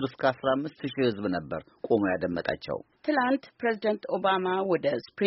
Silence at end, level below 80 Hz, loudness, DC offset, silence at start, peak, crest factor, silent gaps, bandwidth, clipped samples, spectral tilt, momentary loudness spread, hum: 0 s; -62 dBFS; -28 LUFS; under 0.1%; 0 s; -10 dBFS; 18 dB; none; 5.8 kHz; under 0.1%; -4 dB/octave; 8 LU; none